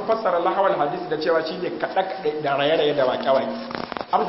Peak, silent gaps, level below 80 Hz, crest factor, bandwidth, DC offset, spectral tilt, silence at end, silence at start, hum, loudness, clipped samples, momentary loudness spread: -6 dBFS; none; -62 dBFS; 16 dB; 5.8 kHz; under 0.1%; -9 dB/octave; 0 s; 0 s; none; -22 LUFS; under 0.1%; 8 LU